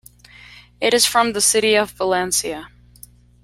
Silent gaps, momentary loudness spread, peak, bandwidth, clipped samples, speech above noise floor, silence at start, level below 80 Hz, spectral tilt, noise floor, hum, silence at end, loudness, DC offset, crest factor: none; 8 LU; -2 dBFS; 16.5 kHz; under 0.1%; 28 dB; 0.8 s; -52 dBFS; -1 dB/octave; -46 dBFS; 60 Hz at -45 dBFS; 0.8 s; -17 LUFS; under 0.1%; 18 dB